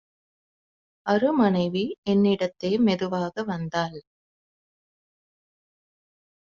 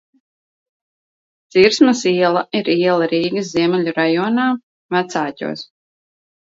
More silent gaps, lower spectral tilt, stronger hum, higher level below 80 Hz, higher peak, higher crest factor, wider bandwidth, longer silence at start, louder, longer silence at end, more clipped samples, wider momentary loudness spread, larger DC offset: second, 1.98-2.03 s vs 4.63-4.89 s; about the same, -5.5 dB/octave vs -5 dB/octave; neither; about the same, -64 dBFS vs -62 dBFS; second, -8 dBFS vs 0 dBFS; about the same, 18 dB vs 18 dB; about the same, 7.2 kHz vs 7.8 kHz; second, 1.05 s vs 1.55 s; second, -24 LUFS vs -17 LUFS; first, 2.55 s vs 0.95 s; neither; about the same, 8 LU vs 10 LU; neither